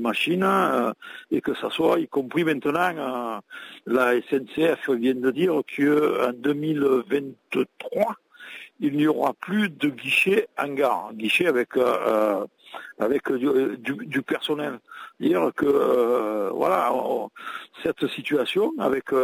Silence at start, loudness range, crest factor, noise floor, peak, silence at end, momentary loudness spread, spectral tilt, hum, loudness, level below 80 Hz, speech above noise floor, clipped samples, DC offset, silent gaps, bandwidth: 0 s; 3 LU; 14 dB; -43 dBFS; -10 dBFS; 0 s; 10 LU; -5.5 dB/octave; none; -24 LUFS; -68 dBFS; 20 dB; under 0.1%; under 0.1%; none; 16 kHz